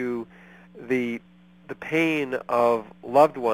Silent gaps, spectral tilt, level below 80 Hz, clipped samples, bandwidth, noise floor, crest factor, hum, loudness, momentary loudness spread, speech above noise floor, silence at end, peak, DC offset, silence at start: none; -6 dB/octave; -66 dBFS; under 0.1%; 16.5 kHz; -45 dBFS; 20 dB; none; -24 LUFS; 19 LU; 22 dB; 0 s; -4 dBFS; under 0.1%; 0 s